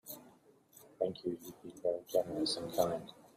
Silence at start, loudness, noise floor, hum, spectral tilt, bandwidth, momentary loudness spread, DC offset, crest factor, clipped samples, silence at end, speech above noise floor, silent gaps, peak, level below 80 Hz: 0.05 s; -37 LUFS; -64 dBFS; none; -4.5 dB/octave; 16 kHz; 14 LU; under 0.1%; 24 dB; under 0.1%; 0.1 s; 27 dB; none; -16 dBFS; -72 dBFS